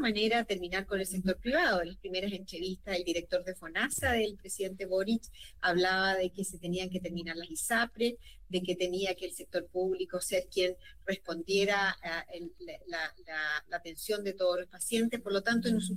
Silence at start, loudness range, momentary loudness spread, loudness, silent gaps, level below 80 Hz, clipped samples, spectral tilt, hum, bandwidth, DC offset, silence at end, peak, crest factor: 0 s; 2 LU; 10 LU; -33 LUFS; none; -56 dBFS; under 0.1%; -3.5 dB/octave; none; 16 kHz; 0.1%; 0 s; -18 dBFS; 16 dB